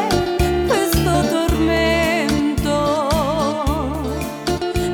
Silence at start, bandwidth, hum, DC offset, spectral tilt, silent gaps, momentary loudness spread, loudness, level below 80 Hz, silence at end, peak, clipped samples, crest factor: 0 s; over 20 kHz; none; under 0.1%; -5 dB/octave; none; 6 LU; -18 LUFS; -28 dBFS; 0 s; -6 dBFS; under 0.1%; 12 dB